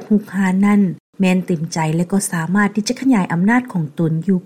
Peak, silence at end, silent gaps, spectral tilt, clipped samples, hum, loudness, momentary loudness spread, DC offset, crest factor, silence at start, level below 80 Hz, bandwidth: -4 dBFS; 0.05 s; 1.00-1.13 s; -6 dB/octave; under 0.1%; none; -17 LUFS; 5 LU; 0.2%; 12 dB; 0 s; -56 dBFS; 14 kHz